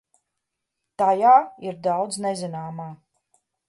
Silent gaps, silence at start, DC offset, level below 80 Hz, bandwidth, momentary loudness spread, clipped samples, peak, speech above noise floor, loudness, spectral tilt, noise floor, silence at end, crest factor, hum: none; 1 s; under 0.1%; -74 dBFS; 11.5 kHz; 18 LU; under 0.1%; -4 dBFS; 60 dB; -21 LUFS; -5 dB/octave; -81 dBFS; 0.75 s; 18 dB; none